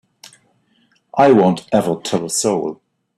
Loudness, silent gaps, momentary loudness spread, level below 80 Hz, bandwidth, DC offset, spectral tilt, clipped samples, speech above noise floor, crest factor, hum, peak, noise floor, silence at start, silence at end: -16 LUFS; none; 11 LU; -58 dBFS; 13.5 kHz; under 0.1%; -5 dB/octave; under 0.1%; 45 dB; 16 dB; none; -2 dBFS; -60 dBFS; 1.15 s; 0.45 s